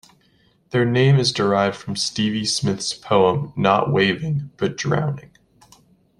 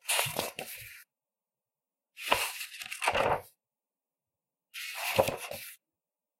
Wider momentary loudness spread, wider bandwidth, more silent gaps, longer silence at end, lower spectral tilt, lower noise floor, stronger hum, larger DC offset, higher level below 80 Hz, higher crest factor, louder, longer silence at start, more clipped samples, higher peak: second, 9 LU vs 16 LU; second, 11.5 kHz vs 16 kHz; neither; first, 1 s vs 0.65 s; first, -5 dB/octave vs -2 dB/octave; second, -59 dBFS vs under -90 dBFS; neither; neither; first, -56 dBFS vs -62 dBFS; second, 18 dB vs 30 dB; first, -20 LUFS vs -32 LUFS; first, 0.75 s vs 0.05 s; neither; first, -2 dBFS vs -6 dBFS